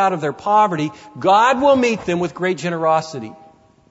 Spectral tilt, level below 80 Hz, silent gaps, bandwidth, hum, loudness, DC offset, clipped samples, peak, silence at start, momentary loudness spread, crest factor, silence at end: -5.5 dB/octave; -56 dBFS; none; 8 kHz; none; -17 LUFS; under 0.1%; under 0.1%; -4 dBFS; 0 s; 13 LU; 14 dB; 0.55 s